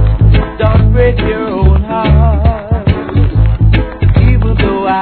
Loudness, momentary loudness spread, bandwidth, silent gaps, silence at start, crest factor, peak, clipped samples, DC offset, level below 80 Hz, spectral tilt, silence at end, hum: -11 LUFS; 4 LU; 4.5 kHz; none; 0 s; 8 dB; 0 dBFS; 0.5%; 0.3%; -12 dBFS; -11.5 dB/octave; 0 s; none